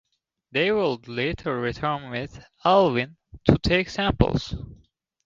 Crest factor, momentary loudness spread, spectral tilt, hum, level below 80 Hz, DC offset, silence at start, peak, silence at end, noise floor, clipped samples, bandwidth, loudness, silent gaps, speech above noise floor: 24 dB; 14 LU; -6.5 dB/octave; none; -40 dBFS; under 0.1%; 0.55 s; 0 dBFS; 0.5 s; -63 dBFS; under 0.1%; 7.6 kHz; -24 LUFS; none; 39 dB